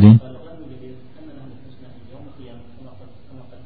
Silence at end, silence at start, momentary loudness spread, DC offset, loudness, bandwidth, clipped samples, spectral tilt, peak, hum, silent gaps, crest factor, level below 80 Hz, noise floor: 3.45 s; 0 s; 16 LU; 1%; -13 LUFS; 4.5 kHz; 0.1%; -10 dB/octave; 0 dBFS; none; none; 20 dB; -52 dBFS; -43 dBFS